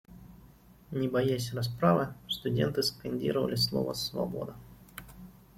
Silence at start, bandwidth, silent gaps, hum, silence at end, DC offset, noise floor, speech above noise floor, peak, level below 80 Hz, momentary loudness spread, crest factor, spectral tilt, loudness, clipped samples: 0.1 s; 16.5 kHz; none; none; 0.25 s; under 0.1%; -56 dBFS; 26 dB; -12 dBFS; -58 dBFS; 21 LU; 20 dB; -5.5 dB/octave; -31 LUFS; under 0.1%